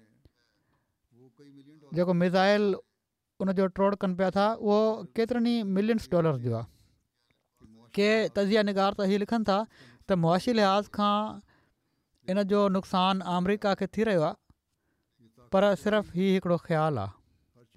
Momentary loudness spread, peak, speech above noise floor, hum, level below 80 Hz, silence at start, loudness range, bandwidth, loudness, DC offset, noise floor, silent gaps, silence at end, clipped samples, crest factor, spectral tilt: 8 LU; -14 dBFS; 56 dB; none; -62 dBFS; 1.9 s; 3 LU; 13 kHz; -27 LUFS; under 0.1%; -82 dBFS; none; 0.65 s; under 0.1%; 14 dB; -7 dB/octave